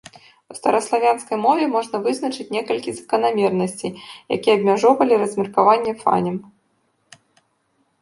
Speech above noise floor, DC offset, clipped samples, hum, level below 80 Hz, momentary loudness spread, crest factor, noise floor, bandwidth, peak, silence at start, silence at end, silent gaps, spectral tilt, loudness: 47 dB; under 0.1%; under 0.1%; none; -66 dBFS; 11 LU; 18 dB; -66 dBFS; 11.5 kHz; -2 dBFS; 0.5 s; 1.6 s; none; -5 dB/octave; -19 LUFS